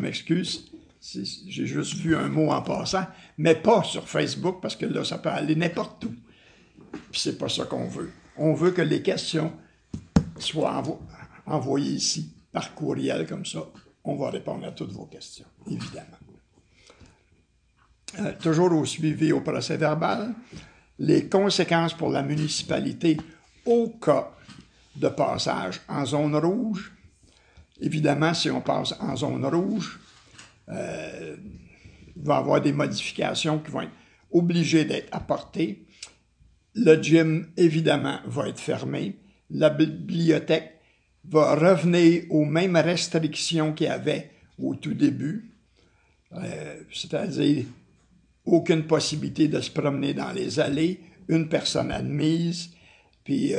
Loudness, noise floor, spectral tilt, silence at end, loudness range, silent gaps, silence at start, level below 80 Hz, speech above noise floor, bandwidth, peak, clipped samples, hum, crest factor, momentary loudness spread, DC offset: -25 LUFS; -64 dBFS; -5.5 dB/octave; 0 s; 8 LU; none; 0 s; -54 dBFS; 39 dB; 10 kHz; -4 dBFS; under 0.1%; none; 22 dB; 16 LU; under 0.1%